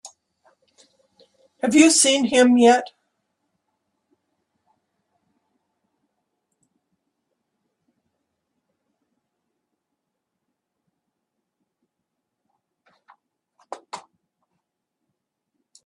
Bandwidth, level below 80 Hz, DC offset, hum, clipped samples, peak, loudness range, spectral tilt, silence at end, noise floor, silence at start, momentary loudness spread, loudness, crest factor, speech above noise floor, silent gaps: 12.5 kHz; -72 dBFS; under 0.1%; none; under 0.1%; -2 dBFS; 4 LU; -2 dB/octave; 1.85 s; -81 dBFS; 0.05 s; 26 LU; -16 LUFS; 24 dB; 65 dB; none